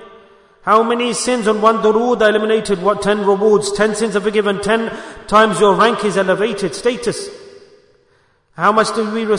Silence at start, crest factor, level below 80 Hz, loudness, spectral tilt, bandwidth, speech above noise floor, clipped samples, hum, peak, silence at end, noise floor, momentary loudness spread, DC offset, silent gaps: 0 s; 16 dB; -48 dBFS; -15 LUFS; -4 dB/octave; 11 kHz; 42 dB; under 0.1%; none; 0 dBFS; 0 s; -56 dBFS; 7 LU; under 0.1%; none